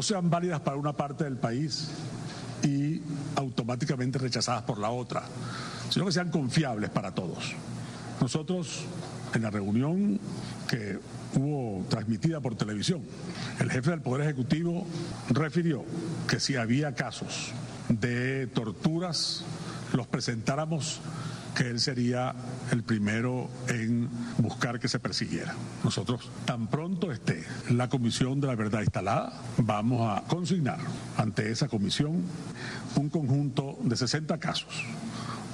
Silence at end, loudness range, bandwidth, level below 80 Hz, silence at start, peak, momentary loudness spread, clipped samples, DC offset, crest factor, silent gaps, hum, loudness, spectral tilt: 0 s; 2 LU; 12 kHz; -58 dBFS; 0 s; -16 dBFS; 9 LU; under 0.1%; under 0.1%; 14 dB; none; none; -31 LUFS; -5.5 dB/octave